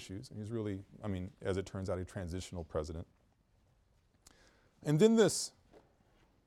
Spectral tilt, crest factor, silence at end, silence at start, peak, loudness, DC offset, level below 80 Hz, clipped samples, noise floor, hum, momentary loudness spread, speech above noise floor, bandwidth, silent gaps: -5.5 dB/octave; 22 dB; 1 s; 0 s; -14 dBFS; -35 LUFS; under 0.1%; -60 dBFS; under 0.1%; -71 dBFS; none; 17 LU; 36 dB; 15.5 kHz; none